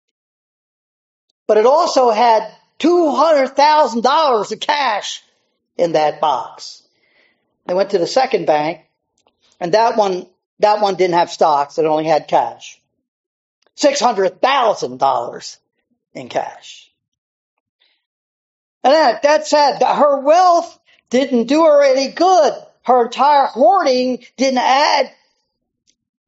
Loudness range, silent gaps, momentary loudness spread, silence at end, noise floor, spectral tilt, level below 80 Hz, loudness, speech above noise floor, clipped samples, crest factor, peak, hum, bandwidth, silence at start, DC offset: 7 LU; 10.46-10.57 s, 13.08-13.62 s, 17.08-17.12 s, 17.18-17.79 s, 18.06-18.81 s; 13 LU; 1.2 s; -71 dBFS; -2 dB/octave; -72 dBFS; -15 LUFS; 57 dB; under 0.1%; 16 dB; 0 dBFS; none; 8 kHz; 1.5 s; under 0.1%